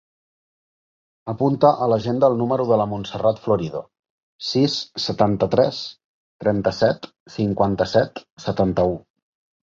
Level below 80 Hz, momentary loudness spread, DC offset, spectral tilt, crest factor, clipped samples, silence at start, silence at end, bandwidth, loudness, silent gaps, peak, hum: -50 dBFS; 13 LU; under 0.1%; -6.5 dB/octave; 20 dB; under 0.1%; 1.25 s; 0.75 s; 7.6 kHz; -21 LUFS; 3.99-4.03 s, 4.10-4.39 s, 6.04-6.39 s, 7.20-7.26 s, 8.30-8.37 s; -2 dBFS; none